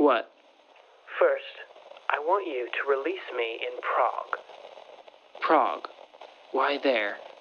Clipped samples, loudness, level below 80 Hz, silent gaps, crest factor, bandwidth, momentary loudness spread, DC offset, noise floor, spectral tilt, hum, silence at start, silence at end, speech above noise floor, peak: under 0.1%; -28 LUFS; -90 dBFS; none; 20 dB; 6.8 kHz; 22 LU; under 0.1%; -57 dBFS; -4 dB/octave; none; 0 s; 0.1 s; 30 dB; -8 dBFS